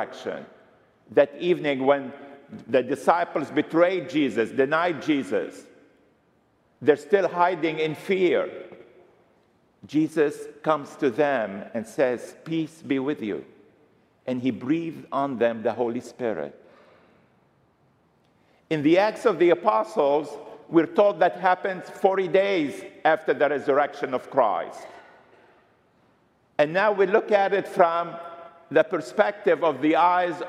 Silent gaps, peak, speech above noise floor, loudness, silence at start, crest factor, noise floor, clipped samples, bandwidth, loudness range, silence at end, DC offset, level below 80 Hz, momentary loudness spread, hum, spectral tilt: none; -4 dBFS; 41 dB; -24 LUFS; 0 s; 22 dB; -64 dBFS; under 0.1%; 13 kHz; 6 LU; 0 s; under 0.1%; -76 dBFS; 13 LU; none; -6 dB/octave